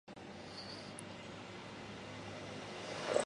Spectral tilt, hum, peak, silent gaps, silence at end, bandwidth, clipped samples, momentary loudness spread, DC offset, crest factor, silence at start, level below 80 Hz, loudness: -3.5 dB/octave; none; -18 dBFS; none; 0 s; 11.5 kHz; under 0.1%; 5 LU; under 0.1%; 28 dB; 0.05 s; -70 dBFS; -46 LUFS